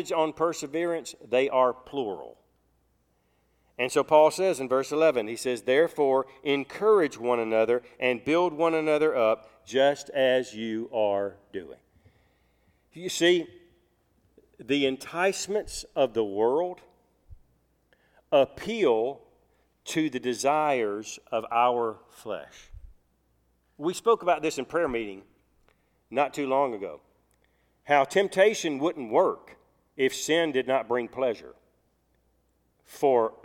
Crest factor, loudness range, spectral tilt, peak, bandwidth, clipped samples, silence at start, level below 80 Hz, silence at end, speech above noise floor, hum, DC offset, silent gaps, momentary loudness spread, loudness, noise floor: 20 dB; 5 LU; -4 dB/octave; -6 dBFS; 16 kHz; under 0.1%; 0 s; -62 dBFS; 0.15 s; 44 dB; none; under 0.1%; none; 12 LU; -26 LUFS; -70 dBFS